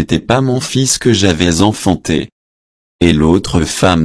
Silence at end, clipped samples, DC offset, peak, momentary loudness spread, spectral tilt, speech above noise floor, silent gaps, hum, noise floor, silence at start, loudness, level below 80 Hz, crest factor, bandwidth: 0 s; under 0.1%; under 0.1%; 0 dBFS; 5 LU; -4.5 dB/octave; over 78 dB; 2.32-2.99 s; none; under -90 dBFS; 0 s; -12 LUFS; -32 dBFS; 12 dB; 11 kHz